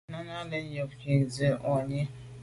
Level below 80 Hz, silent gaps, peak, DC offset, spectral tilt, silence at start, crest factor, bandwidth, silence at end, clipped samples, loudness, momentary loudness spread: -58 dBFS; none; -14 dBFS; under 0.1%; -7 dB/octave; 0.1 s; 16 dB; 11.5 kHz; 0 s; under 0.1%; -31 LUFS; 10 LU